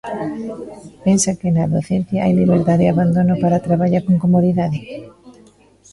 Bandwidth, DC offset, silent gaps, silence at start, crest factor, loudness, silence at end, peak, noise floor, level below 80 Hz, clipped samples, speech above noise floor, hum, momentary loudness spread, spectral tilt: 11.5 kHz; under 0.1%; none; 0.05 s; 14 dB; -16 LUFS; 0.6 s; -4 dBFS; -49 dBFS; -46 dBFS; under 0.1%; 32 dB; none; 14 LU; -7 dB/octave